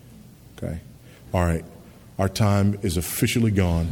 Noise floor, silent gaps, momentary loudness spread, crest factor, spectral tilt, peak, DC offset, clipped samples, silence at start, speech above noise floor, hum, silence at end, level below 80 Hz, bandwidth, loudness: -46 dBFS; none; 15 LU; 18 dB; -6 dB/octave; -6 dBFS; under 0.1%; under 0.1%; 0.1 s; 24 dB; none; 0 s; -38 dBFS; 19 kHz; -23 LUFS